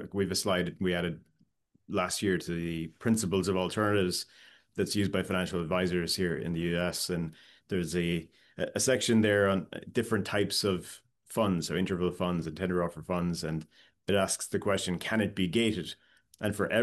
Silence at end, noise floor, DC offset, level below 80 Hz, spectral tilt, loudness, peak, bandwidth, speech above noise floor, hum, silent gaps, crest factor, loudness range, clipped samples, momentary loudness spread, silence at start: 0 s; -70 dBFS; under 0.1%; -62 dBFS; -4.5 dB/octave; -31 LUFS; -14 dBFS; 12.5 kHz; 40 dB; none; none; 18 dB; 3 LU; under 0.1%; 9 LU; 0 s